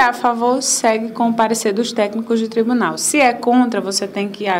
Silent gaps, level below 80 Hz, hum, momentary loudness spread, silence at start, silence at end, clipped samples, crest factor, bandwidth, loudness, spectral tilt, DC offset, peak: none; -64 dBFS; none; 6 LU; 0 s; 0 s; under 0.1%; 14 dB; 16 kHz; -16 LUFS; -3 dB/octave; under 0.1%; -2 dBFS